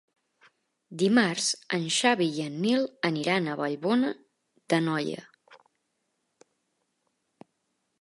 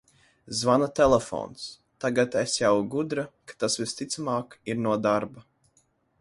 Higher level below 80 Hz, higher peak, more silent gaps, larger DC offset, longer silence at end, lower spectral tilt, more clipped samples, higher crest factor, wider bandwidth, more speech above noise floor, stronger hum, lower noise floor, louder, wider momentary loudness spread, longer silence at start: second, -80 dBFS vs -56 dBFS; about the same, -6 dBFS vs -8 dBFS; neither; neither; first, 2.45 s vs 0.8 s; about the same, -4 dB/octave vs -4.5 dB/octave; neither; about the same, 22 dB vs 20 dB; about the same, 11.5 kHz vs 11.5 kHz; first, 51 dB vs 42 dB; neither; first, -78 dBFS vs -68 dBFS; about the same, -27 LUFS vs -26 LUFS; second, 9 LU vs 13 LU; first, 0.9 s vs 0.45 s